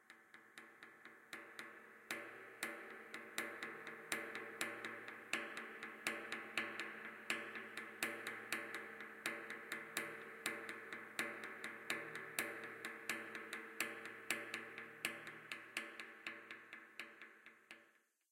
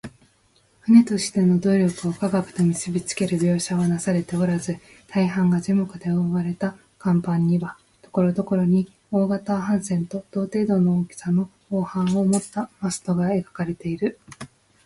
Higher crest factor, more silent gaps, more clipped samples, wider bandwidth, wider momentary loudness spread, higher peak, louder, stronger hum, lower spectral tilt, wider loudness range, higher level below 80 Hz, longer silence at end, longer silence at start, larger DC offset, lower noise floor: first, 30 dB vs 18 dB; neither; neither; first, 16.5 kHz vs 11.5 kHz; first, 13 LU vs 9 LU; second, -18 dBFS vs -4 dBFS; second, -47 LUFS vs -22 LUFS; neither; second, -1.5 dB/octave vs -6.5 dB/octave; about the same, 5 LU vs 3 LU; second, under -90 dBFS vs -58 dBFS; about the same, 0.4 s vs 0.4 s; about the same, 0 s vs 0.05 s; neither; first, -74 dBFS vs -61 dBFS